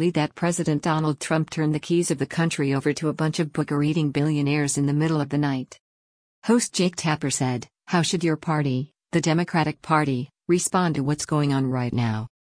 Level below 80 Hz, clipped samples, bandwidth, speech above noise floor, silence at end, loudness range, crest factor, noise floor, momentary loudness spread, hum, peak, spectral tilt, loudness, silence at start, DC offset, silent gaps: -58 dBFS; under 0.1%; 10.5 kHz; over 67 dB; 0.3 s; 1 LU; 18 dB; under -90 dBFS; 5 LU; none; -6 dBFS; -5.5 dB/octave; -24 LUFS; 0 s; under 0.1%; 5.80-6.42 s